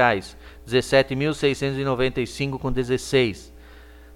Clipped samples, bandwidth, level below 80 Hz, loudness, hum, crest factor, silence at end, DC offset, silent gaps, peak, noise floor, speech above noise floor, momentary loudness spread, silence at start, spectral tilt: under 0.1%; 15.5 kHz; -42 dBFS; -23 LUFS; none; 20 dB; 0 s; under 0.1%; none; -4 dBFS; -45 dBFS; 23 dB; 8 LU; 0 s; -5.5 dB/octave